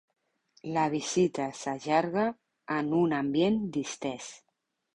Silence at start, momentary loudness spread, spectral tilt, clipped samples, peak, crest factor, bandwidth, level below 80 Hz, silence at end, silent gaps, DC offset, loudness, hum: 0.65 s; 10 LU; -5 dB/octave; under 0.1%; -12 dBFS; 18 dB; 11 kHz; -68 dBFS; 0.6 s; none; under 0.1%; -29 LUFS; none